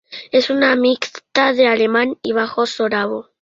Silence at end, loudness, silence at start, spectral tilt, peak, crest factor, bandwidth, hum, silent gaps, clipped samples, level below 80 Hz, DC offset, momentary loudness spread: 0.2 s; -17 LUFS; 0.1 s; -4 dB/octave; -2 dBFS; 16 dB; 7.6 kHz; none; none; under 0.1%; -62 dBFS; under 0.1%; 7 LU